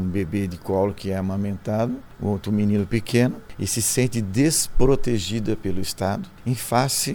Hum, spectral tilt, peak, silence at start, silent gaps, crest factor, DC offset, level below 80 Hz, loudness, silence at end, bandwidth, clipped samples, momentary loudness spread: none; -5 dB/octave; -4 dBFS; 0 s; none; 18 dB; under 0.1%; -34 dBFS; -23 LUFS; 0 s; over 20 kHz; under 0.1%; 7 LU